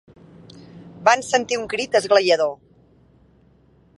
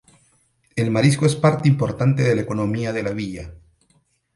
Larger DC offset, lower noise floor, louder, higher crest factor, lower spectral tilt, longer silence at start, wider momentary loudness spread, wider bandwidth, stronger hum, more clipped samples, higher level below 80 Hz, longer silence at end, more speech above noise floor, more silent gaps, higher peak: neither; second, -55 dBFS vs -63 dBFS; about the same, -19 LUFS vs -20 LUFS; about the same, 22 dB vs 20 dB; second, -2.5 dB/octave vs -6.5 dB/octave; about the same, 0.75 s vs 0.75 s; second, 8 LU vs 14 LU; about the same, 11.5 kHz vs 11.5 kHz; neither; neither; second, -62 dBFS vs -50 dBFS; first, 1.45 s vs 0.8 s; second, 37 dB vs 44 dB; neither; about the same, -2 dBFS vs -2 dBFS